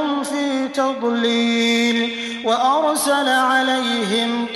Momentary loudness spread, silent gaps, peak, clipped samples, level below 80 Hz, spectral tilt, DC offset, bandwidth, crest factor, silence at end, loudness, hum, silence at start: 5 LU; none; -4 dBFS; under 0.1%; -64 dBFS; -2.5 dB/octave; under 0.1%; 15 kHz; 14 dB; 0 s; -18 LUFS; none; 0 s